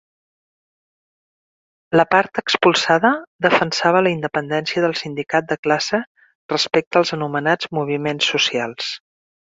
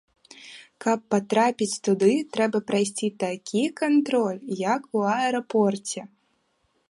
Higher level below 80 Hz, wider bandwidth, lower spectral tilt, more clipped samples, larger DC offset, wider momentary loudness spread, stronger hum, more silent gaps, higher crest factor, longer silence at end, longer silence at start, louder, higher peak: first, -62 dBFS vs -74 dBFS; second, 7.8 kHz vs 11.5 kHz; about the same, -4 dB/octave vs -5 dB/octave; neither; neither; about the same, 9 LU vs 9 LU; neither; first, 3.27-3.39 s, 5.59-5.63 s, 6.07-6.15 s, 6.35-6.49 s, 6.87-6.91 s vs none; about the same, 20 dB vs 18 dB; second, 0.45 s vs 0.85 s; first, 1.9 s vs 0.4 s; first, -18 LUFS vs -24 LUFS; first, 0 dBFS vs -8 dBFS